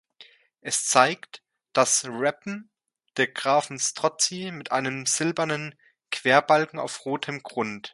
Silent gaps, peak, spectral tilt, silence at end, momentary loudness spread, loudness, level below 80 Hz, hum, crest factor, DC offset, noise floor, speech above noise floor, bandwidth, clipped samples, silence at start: none; -2 dBFS; -2.5 dB/octave; 0.05 s; 15 LU; -24 LUFS; -74 dBFS; none; 24 dB; under 0.1%; -54 dBFS; 29 dB; 12 kHz; under 0.1%; 0.2 s